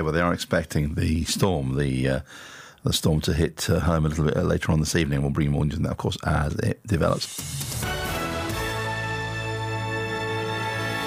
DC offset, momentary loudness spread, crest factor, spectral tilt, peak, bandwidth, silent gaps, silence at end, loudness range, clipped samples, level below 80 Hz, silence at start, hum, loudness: under 0.1%; 6 LU; 18 dB; -5 dB/octave; -6 dBFS; 16 kHz; none; 0 s; 4 LU; under 0.1%; -40 dBFS; 0 s; none; -25 LUFS